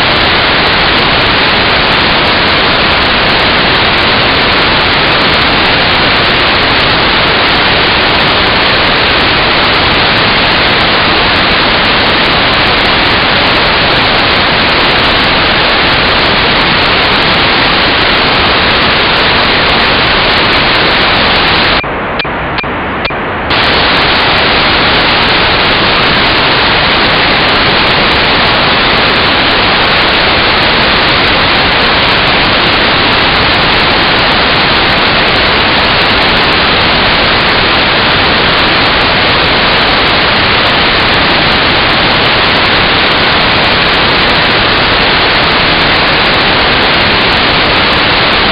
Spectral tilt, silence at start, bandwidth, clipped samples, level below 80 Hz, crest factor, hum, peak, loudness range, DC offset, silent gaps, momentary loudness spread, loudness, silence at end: -5.5 dB/octave; 0 s; 17.5 kHz; 0.2%; -26 dBFS; 8 dB; none; 0 dBFS; 0 LU; under 0.1%; none; 0 LU; -6 LUFS; 0 s